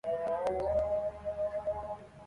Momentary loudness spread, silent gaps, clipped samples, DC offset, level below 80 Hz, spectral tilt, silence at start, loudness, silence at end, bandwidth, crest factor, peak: 7 LU; none; under 0.1%; under 0.1%; -52 dBFS; -7 dB/octave; 0.05 s; -34 LUFS; 0 s; 11 kHz; 14 dB; -20 dBFS